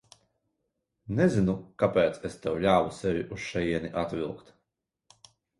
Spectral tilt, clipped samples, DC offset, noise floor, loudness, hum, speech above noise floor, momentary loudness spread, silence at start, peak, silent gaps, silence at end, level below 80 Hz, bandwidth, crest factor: -7 dB/octave; under 0.1%; under 0.1%; -83 dBFS; -28 LUFS; none; 56 dB; 10 LU; 1.05 s; -10 dBFS; none; 1.2 s; -54 dBFS; 11.5 kHz; 20 dB